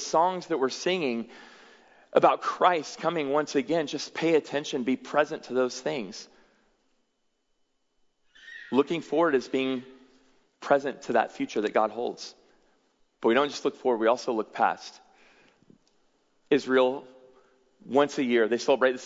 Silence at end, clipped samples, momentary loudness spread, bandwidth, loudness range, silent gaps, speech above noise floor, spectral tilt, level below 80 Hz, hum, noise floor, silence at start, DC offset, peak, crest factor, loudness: 0 s; under 0.1%; 11 LU; 7.8 kHz; 5 LU; none; 48 dB; -4.5 dB/octave; -78 dBFS; none; -74 dBFS; 0 s; under 0.1%; -6 dBFS; 22 dB; -27 LUFS